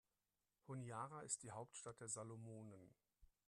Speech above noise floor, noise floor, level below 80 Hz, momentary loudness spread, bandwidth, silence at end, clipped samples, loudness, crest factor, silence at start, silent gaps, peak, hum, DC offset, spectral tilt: over 36 dB; under -90 dBFS; -82 dBFS; 10 LU; 12.5 kHz; 0.2 s; under 0.1%; -52 LUFS; 26 dB; 0.65 s; none; -30 dBFS; none; under 0.1%; -4 dB/octave